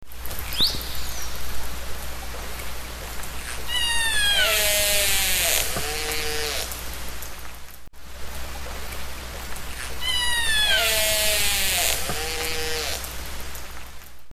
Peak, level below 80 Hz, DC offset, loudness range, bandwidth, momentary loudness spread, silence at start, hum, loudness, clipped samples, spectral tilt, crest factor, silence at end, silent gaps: -4 dBFS; -36 dBFS; under 0.1%; 11 LU; 16.5 kHz; 17 LU; 0 s; none; -23 LUFS; under 0.1%; -0.5 dB/octave; 22 dB; 0 s; none